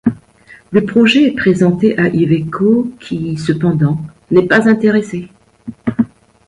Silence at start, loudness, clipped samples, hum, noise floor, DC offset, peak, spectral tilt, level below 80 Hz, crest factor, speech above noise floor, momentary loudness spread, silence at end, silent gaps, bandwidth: 0.05 s; -13 LUFS; under 0.1%; none; -43 dBFS; under 0.1%; 0 dBFS; -7 dB/octave; -48 dBFS; 14 dB; 31 dB; 12 LU; 0.4 s; none; 10.5 kHz